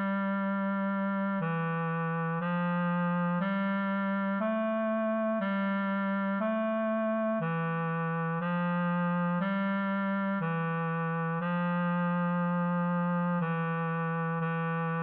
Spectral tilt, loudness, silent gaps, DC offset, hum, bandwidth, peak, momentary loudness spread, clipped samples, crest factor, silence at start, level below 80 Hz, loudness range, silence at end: -7 dB/octave; -30 LUFS; none; under 0.1%; none; 4.2 kHz; -20 dBFS; 2 LU; under 0.1%; 10 dB; 0 s; -88 dBFS; 0 LU; 0 s